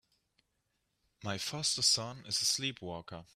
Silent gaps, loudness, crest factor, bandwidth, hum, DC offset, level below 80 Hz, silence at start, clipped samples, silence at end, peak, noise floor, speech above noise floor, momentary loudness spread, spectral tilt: none; -32 LUFS; 22 dB; 15.5 kHz; none; under 0.1%; -72 dBFS; 1.2 s; under 0.1%; 0.1 s; -14 dBFS; -81 dBFS; 46 dB; 16 LU; -1.5 dB/octave